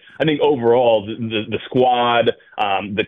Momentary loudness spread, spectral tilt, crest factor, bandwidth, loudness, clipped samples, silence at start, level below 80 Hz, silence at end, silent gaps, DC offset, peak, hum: 8 LU; -8 dB/octave; 14 dB; 4.2 kHz; -18 LUFS; under 0.1%; 0.2 s; -56 dBFS; 0 s; none; under 0.1%; -4 dBFS; none